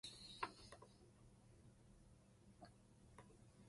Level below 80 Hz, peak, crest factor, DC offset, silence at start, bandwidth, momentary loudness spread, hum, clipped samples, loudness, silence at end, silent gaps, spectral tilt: -74 dBFS; -30 dBFS; 30 dB; under 0.1%; 0.05 s; 11.5 kHz; 18 LU; none; under 0.1%; -59 LUFS; 0 s; none; -3.5 dB/octave